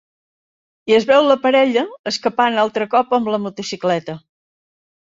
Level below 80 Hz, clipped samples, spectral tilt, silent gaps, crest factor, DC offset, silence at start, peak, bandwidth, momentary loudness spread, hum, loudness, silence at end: -64 dBFS; under 0.1%; -4.5 dB/octave; 1.99-2.04 s; 16 dB; under 0.1%; 0.85 s; -2 dBFS; 7.8 kHz; 11 LU; none; -17 LUFS; 0.95 s